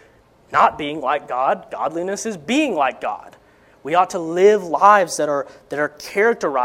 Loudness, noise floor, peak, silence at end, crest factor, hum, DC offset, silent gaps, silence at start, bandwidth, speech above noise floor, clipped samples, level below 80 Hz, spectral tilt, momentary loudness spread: -19 LUFS; -52 dBFS; 0 dBFS; 0 s; 20 dB; none; under 0.1%; none; 0.5 s; 16 kHz; 34 dB; under 0.1%; -60 dBFS; -4 dB/octave; 11 LU